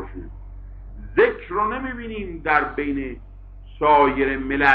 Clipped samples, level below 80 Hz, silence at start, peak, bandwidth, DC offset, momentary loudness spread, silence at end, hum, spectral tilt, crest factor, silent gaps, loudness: under 0.1%; -38 dBFS; 0 s; -2 dBFS; 6.8 kHz; under 0.1%; 24 LU; 0 s; none; -7.5 dB/octave; 20 dB; none; -21 LUFS